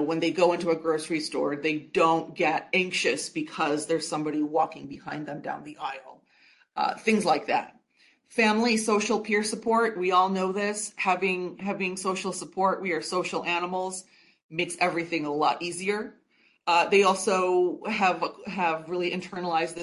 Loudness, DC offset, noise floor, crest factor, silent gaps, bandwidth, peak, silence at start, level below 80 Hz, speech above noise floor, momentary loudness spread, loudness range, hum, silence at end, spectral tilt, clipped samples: -26 LUFS; under 0.1%; -64 dBFS; 18 dB; 14.44-14.49 s; 11.5 kHz; -8 dBFS; 0 s; -72 dBFS; 37 dB; 11 LU; 5 LU; none; 0 s; -4 dB/octave; under 0.1%